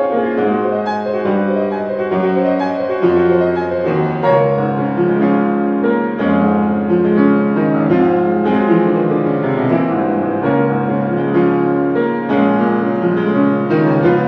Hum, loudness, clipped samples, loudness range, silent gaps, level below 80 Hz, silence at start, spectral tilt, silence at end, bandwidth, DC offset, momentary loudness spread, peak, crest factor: none; -15 LUFS; under 0.1%; 2 LU; none; -52 dBFS; 0 s; -10 dB/octave; 0 s; 5.6 kHz; under 0.1%; 4 LU; 0 dBFS; 14 dB